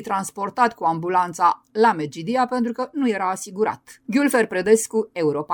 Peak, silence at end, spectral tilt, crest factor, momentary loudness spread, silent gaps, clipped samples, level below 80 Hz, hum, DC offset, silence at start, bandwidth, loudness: -4 dBFS; 0 s; -4.5 dB/octave; 18 dB; 7 LU; none; under 0.1%; -66 dBFS; none; under 0.1%; 0 s; over 20 kHz; -21 LUFS